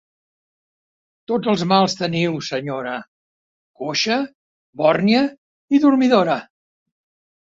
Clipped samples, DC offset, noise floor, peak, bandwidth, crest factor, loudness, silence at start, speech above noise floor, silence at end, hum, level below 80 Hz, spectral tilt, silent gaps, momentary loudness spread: under 0.1%; under 0.1%; under -90 dBFS; 0 dBFS; 7.8 kHz; 20 dB; -19 LUFS; 1.3 s; over 72 dB; 1.05 s; none; -64 dBFS; -5.5 dB/octave; 3.08-3.74 s, 4.35-4.73 s, 5.38-5.68 s; 11 LU